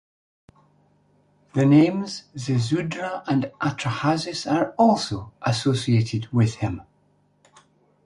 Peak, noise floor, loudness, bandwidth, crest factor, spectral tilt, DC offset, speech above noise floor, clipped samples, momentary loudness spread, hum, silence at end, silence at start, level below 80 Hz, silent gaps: -6 dBFS; -63 dBFS; -23 LUFS; 11.5 kHz; 18 dB; -6.5 dB/octave; under 0.1%; 41 dB; under 0.1%; 12 LU; 50 Hz at -50 dBFS; 1.25 s; 1.55 s; -54 dBFS; none